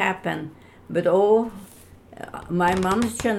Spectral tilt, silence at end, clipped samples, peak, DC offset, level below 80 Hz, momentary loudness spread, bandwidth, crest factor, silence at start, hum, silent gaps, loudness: -5.5 dB/octave; 0 s; under 0.1%; -6 dBFS; under 0.1%; -50 dBFS; 20 LU; 15.5 kHz; 16 dB; 0 s; none; none; -22 LUFS